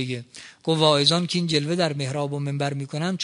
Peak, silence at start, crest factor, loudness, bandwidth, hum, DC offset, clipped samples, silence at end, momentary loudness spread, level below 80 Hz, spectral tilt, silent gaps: -4 dBFS; 0 s; 20 dB; -23 LUFS; 10.5 kHz; none; under 0.1%; under 0.1%; 0 s; 13 LU; -66 dBFS; -5 dB/octave; none